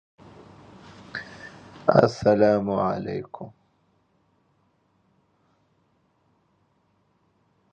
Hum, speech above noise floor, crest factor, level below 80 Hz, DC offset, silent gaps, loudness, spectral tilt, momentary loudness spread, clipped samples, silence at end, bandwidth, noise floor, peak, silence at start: none; 46 dB; 28 dB; -60 dBFS; under 0.1%; none; -23 LUFS; -7.5 dB/octave; 25 LU; under 0.1%; 4.25 s; 8.4 kHz; -67 dBFS; 0 dBFS; 1 s